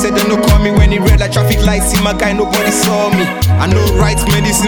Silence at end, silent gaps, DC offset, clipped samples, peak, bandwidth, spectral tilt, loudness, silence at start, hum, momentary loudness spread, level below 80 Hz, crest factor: 0 s; none; under 0.1%; under 0.1%; 0 dBFS; 17.5 kHz; -5 dB/octave; -11 LUFS; 0 s; none; 3 LU; -16 dBFS; 10 dB